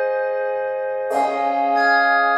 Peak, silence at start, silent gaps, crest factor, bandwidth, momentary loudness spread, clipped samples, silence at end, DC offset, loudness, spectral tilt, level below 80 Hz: -6 dBFS; 0 s; none; 14 dB; 12.5 kHz; 8 LU; under 0.1%; 0 s; under 0.1%; -19 LUFS; -3 dB/octave; -76 dBFS